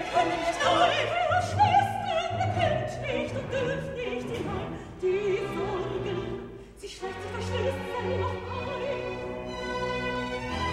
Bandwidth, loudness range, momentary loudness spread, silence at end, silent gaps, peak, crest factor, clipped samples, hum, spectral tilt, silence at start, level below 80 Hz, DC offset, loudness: 14 kHz; 7 LU; 12 LU; 0 s; none; -10 dBFS; 20 dB; under 0.1%; none; -5 dB/octave; 0 s; -50 dBFS; under 0.1%; -29 LUFS